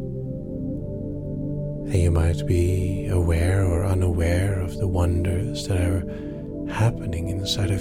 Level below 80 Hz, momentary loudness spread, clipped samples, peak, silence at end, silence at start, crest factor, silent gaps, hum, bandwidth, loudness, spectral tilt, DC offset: -32 dBFS; 10 LU; under 0.1%; -8 dBFS; 0 s; 0 s; 14 dB; none; 50 Hz at -45 dBFS; 15 kHz; -24 LUFS; -6.5 dB/octave; under 0.1%